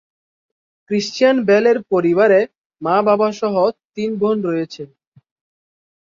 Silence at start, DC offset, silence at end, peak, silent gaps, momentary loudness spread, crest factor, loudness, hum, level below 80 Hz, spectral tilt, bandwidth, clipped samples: 0.9 s; under 0.1%; 1.2 s; -2 dBFS; 2.57-2.70 s, 3.85-3.90 s; 13 LU; 16 dB; -17 LUFS; none; -64 dBFS; -6 dB/octave; 7.6 kHz; under 0.1%